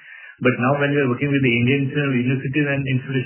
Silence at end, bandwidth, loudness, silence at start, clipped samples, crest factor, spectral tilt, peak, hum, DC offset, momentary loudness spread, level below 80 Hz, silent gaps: 0 s; 3.2 kHz; -19 LUFS; 0.05 s; under 0.1%; 16 dB; -11 dB/octave; -4 dBFS; none; under 0.1%; 5 LU; -54 dBFS; none